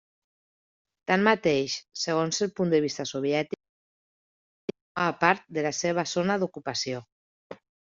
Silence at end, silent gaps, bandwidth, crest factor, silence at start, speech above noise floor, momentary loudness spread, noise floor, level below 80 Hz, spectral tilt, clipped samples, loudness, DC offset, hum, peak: 0.25 s; 3.69-4.68 s, 4.81-4.95 s, 7.12-7.50 s; 7.8 kHz; 22 dB; 1.1 s; over 64 dB; 14 LU; under -90 dBFS; -68 dBFS; -3.5 dB/octave; under 0.1%; -27 LUFS; under 0.1%; none; -6 dBFS